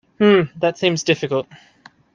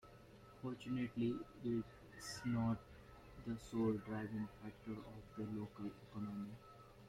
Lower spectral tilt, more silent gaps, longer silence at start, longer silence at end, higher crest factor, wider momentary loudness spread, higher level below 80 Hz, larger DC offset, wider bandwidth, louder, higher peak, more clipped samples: second, -5 dB/octave vs -7 dB/octave; neither; first, 0.2 s vs 0.05 s; first, 0.7 s vs 0 s; about the same, 16 dB vs 18 dB; second, 9 LU vs 19 LU; about the same, -62 dBFS vs -66 dBFS; neither; second, 7.4 kHz vs 14.5 kHz; first, -18 LUFS vs -45 LUFS; first, -2 dBFS vs -28 dBFS; neither